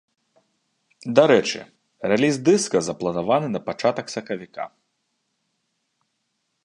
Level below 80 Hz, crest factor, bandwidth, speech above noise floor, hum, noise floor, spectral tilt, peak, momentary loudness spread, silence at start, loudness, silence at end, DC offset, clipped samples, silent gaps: -64 dBFS; 24 dB; 11 kHz; 54 dB; none; -75 dBFS; -4.5 dB/octave; 0 dBFS; 16 LU; 1.05 s; -21 LUFS; 1.95 s; under 0.1%; under 0.1%; none